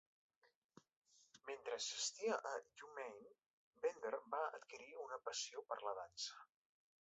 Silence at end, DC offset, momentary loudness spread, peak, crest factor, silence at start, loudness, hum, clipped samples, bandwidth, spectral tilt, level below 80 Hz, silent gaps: 0.6 s; under 0.1%; 13 LU; -30 dBFS; 20 dB; 1.35 s; -47 LUFS; none; under 0.1%; 8 kHz; 1 dB/octave; under -90 dBFS; 3.46-3.71 s